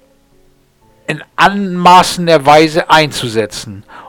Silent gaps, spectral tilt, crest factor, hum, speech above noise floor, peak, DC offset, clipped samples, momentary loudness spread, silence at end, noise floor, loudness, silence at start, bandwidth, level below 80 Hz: none; -4.5 dB/octave; 12 dB; none; 39 dB; 0 dBFS; under 0.1%; 0.6%; 16 LU; 0 s; -50 dBFS; -10 LUFS; 1.1 s; 19.5 kHz; -44 dBFS